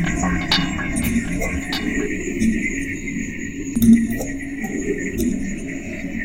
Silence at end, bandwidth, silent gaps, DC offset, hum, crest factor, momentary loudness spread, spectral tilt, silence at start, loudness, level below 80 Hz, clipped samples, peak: 0 s; 16.5 kHz; none; 0.7%; none; 18 dB; 11 LU; -4.5 dB/octave; 0 s; -21 LUFS; -32 dBFS; under 0.1%; -2 dBFS